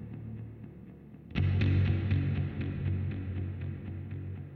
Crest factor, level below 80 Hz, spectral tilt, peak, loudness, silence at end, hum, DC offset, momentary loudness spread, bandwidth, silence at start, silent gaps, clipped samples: 16 dB; -48 dBFS; -10 dB/octave; -16 dBFS; -33 LUFS; 0 s; none; under 0.1%; 20 LU; 4.6 kHz; 0 s; none; under 0.1%